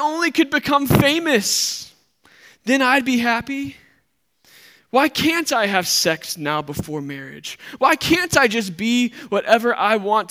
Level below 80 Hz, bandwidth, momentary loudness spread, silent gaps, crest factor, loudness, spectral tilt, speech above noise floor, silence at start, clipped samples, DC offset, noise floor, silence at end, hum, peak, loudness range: -52 dBFS; 16.5 kHz; 13 LU; none; 20 dB; -18 LUFS; -3.5 dB/octave; 47 dB; 0 s; under 0.1%; under 0.1%; -66 dBFS; 0.05 s; none; 0 dBFS; 3 LU